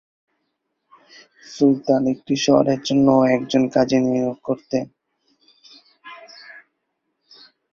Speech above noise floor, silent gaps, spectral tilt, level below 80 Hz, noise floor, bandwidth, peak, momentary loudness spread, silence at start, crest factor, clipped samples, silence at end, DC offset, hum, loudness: 56 dB; none; -6 dB/octave; -60 dBFS; -75 dBFS; 7.2 kHz; -2 dBFS; 24 LU; 1.5 s; 20 dB; under 0.1%; 1.15 s; under 0.1%; none; -19 LUFS